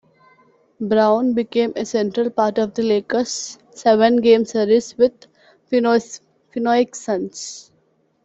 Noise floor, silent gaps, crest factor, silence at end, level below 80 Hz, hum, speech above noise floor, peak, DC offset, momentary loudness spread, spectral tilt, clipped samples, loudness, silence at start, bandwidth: -62 dBFS; none; 16 dB; 0.65 s; -62 dBFS; none; 44 dB; -2 dBFS; under 0.1%; 16 LU; -4.5 dB/octave; under 0.1%; -18 LUFS; 0.8 s; 8.2 kHz